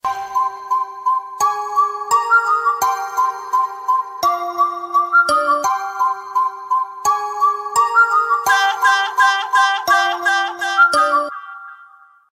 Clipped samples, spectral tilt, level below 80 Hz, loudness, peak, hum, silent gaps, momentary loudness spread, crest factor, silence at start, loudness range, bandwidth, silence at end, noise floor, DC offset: under 0.1%; 0 dB/octave; -64 dBFS; -16 LUFS; -2 dBFS; none; none; 7 LU; 16 dB; 0.05 s; 3 LU; 16 kHz; 0.5 s; -46 dBFS; under 0.1%